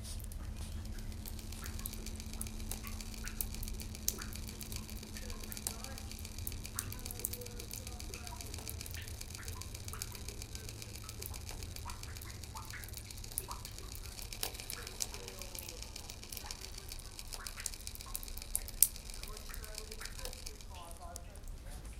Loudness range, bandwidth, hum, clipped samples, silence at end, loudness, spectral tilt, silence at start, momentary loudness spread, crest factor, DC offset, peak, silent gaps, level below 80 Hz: 7 LU; 17 kHz; none; under 0.1%; 0 s; -42 LUFS; -2.5 dB/octave; 0 s; 7 LU; 44 dB; under 0.1%; 0 dBFS; none; -48 dBFS